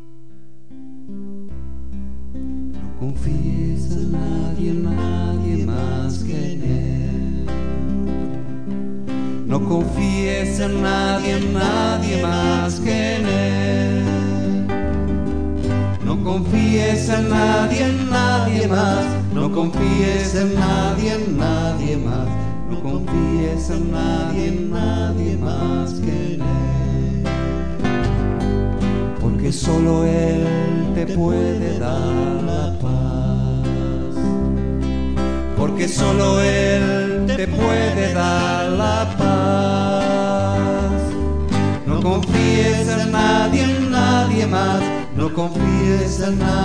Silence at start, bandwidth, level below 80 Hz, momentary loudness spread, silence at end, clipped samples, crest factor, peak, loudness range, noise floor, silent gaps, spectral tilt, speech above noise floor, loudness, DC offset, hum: 0 s; 10 kHz; -28 dBFS; 8 LU; 0 s; under 0.1%; 16 dB; -4 dBFS; 5 LU; -46 dBFS; none; -6.5 dB/octave; 28 dB; -19 LUFS; 4%; none